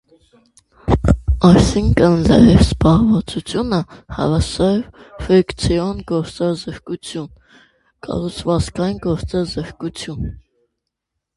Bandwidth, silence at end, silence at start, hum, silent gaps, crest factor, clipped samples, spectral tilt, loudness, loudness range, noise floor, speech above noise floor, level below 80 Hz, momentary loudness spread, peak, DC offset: 11.5 kHz; 0.95 s; 0.85 s; none; none; 16 dB; under 0.1%; -7 dB/octave; -16 LUFS; 10 LU; -78 dBFS; 62 dB; -28 dBFS; 17 LU; 0 dBFS; under 0.1%